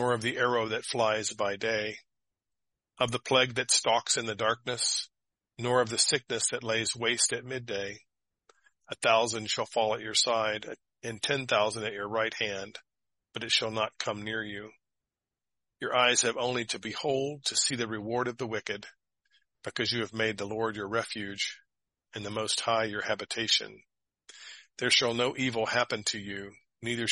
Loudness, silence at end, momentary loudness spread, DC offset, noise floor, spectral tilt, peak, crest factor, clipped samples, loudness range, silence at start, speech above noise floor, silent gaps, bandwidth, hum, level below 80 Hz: -29 LUFS; 0 s; 15 LU; under 0.1%; -89 dBFS; -2 dB/octave; -10 dBFS; 22 dB; under 0.1%; 5 LU; 0 s; 59 dB; none; 11.5 kHz; none; -70 dBFS